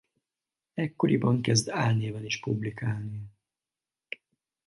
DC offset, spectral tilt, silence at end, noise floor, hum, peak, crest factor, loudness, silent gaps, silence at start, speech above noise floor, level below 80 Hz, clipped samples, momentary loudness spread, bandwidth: under 0.1%; -5.5 dB/octave; 1.4 s; under -90 dBFS; none; -10 dBFS; 20 dB; -28 LUFS; none; 0.75 s; over 62 dB; -62 dBFS; under 0.1%; 18 LU; 11.5 kHz